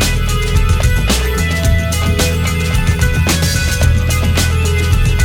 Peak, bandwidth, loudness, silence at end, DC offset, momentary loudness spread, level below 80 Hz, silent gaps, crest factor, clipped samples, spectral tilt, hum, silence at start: 0 dBFS; 17.5 kHz; -14 LUFS; 0 s; under 0.1%; 2 LU; -16 dBFS; none; 12 dB; under 0.1%; -4.5 dB/octave; none; 0 s